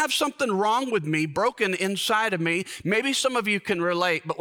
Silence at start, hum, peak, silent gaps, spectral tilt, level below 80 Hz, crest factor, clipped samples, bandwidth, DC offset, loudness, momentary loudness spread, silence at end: 0 s; none; -10 dBFS; none; -3.5 dB/octave; -66 dBFS; 14 dB; under 0.1%; over 20 kHz; under 0.1%; -24 LUFS; 2 LU; 0 s